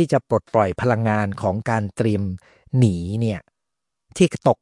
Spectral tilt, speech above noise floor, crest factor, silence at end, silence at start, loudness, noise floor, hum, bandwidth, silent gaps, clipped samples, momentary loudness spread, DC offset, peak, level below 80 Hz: -7 dB/octave; 64 dB; 18 dB; 0.1 s; 0 s; -21 LUFS; -84 dBFS; none; 11.5 kHz; none; under 0.1%; 8 LU; under 0.1%; -4 dBFS; -54 dBFS